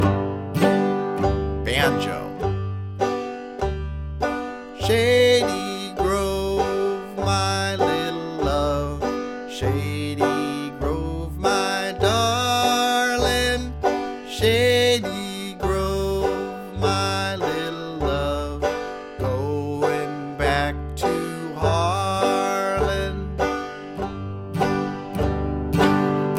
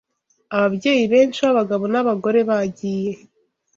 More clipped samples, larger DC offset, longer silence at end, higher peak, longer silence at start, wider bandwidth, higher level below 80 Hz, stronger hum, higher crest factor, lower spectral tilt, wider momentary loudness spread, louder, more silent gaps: neither; neither; second, 0 s vs 0.6 s; about the same, -4 dBFS vs -4 dBFS; second, 0 s vs 0.5 s; first, 16.5 kHz vs 7.6 kHz; first, -36 dBFS vs -62 dBFS; neither; about the same, 18 dB vs 16 dB; about the same, -5 dB/octave vs -6 dB/octave; about the same, 10 LU vs 10 LU; second, -23 LUFS vs -19 LUFS; neither